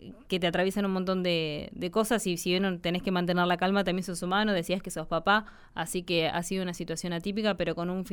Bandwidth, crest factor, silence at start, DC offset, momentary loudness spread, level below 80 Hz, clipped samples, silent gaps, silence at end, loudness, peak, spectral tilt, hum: 19.5 kHz; 16 dB; 0 s; under 0.1%; 7 LU; -52 dBFS; under 0.1%; none; 0 s; -29 LUFS; -12 dBFS; -4.5 dB/octave; none